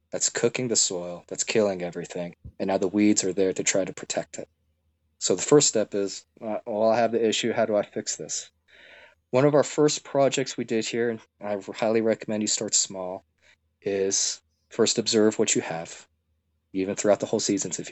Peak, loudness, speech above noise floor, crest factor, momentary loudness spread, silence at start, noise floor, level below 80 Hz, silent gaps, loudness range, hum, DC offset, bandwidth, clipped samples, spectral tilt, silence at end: -6 dBFS; -25 LUFS; 48 dB; 20 dB; 14 LU; 0.15 s; -73 dBFS; -68 dBFS; none; 3 LU; none; under 0.1%; 8.4 kHz; under 0.1%; -3 dB/octave; 0 s